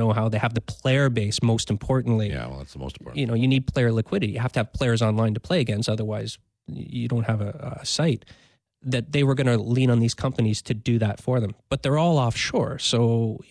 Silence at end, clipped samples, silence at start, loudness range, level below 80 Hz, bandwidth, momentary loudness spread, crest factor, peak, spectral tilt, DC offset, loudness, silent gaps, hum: 0.1 s; under 0.1%; 0 s; 3 LU; -48 dBFS; 11 kHz; 11 LU; 12 dB; -10 dBFS; -6 dB/octave; under 0.1%; -24 LUFS; none; none